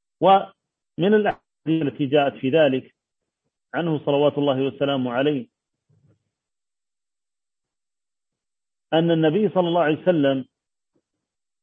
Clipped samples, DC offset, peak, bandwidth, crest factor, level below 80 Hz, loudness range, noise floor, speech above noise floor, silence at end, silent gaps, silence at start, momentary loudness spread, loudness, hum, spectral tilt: under 0.1%; under 0.1%; -4 dBFS; 3.9 kHz; 18 dB; -68 dBFS; 7 LU; under -90 dBFS; over 70 dB; 1.2 s; none; 0.2 s; 9 LU; -21 LUFS; none; -9 dB/octave